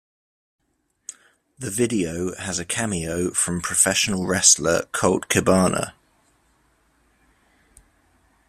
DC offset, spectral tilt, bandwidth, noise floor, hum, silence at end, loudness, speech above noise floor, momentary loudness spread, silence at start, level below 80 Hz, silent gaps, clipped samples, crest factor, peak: under 0.1%; -3 dB/octave; 16 kHz; -64 dBFS; none; 2.55 s; -20 LUFS; 43 dB; 18 LU; 1.6 s; -54 dBFS; none; under 0.1%; 24 dB; 0 dBFS